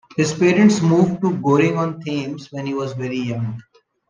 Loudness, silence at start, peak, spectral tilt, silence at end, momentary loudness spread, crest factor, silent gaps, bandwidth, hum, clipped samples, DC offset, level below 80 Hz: -19 LUFS; 0.15 s; -2 dBFS; -6.5 dB/octave; 0.5 s; 13 LU; 16 dB; none; 9.8 kHz; none; under 0.1%; under 0.1%; -58 dBFS